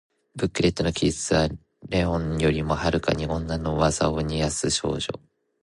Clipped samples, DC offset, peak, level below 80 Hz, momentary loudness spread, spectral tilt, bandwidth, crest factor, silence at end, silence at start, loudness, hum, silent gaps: under 0.1%; under 0.1%; -8 dBFS; -38 dBFS; 7 LU; -5 dB/octave; 11.5 kHz; 18 dB; 0.5 s; 0.35 s; -25 LUFS; none; none